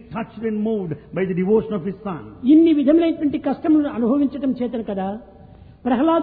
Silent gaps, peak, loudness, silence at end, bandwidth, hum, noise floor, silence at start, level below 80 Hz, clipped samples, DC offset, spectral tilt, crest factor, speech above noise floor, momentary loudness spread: none; -4 dBFS; -20 LUFS; 0 s; 4.3 kHz; none; -44 dBFS; 0.1 s; -52 dBFS; under 0.1%; under 0.1%; -11.5 dB/octave; 14 dB; 25 dB; 14 LU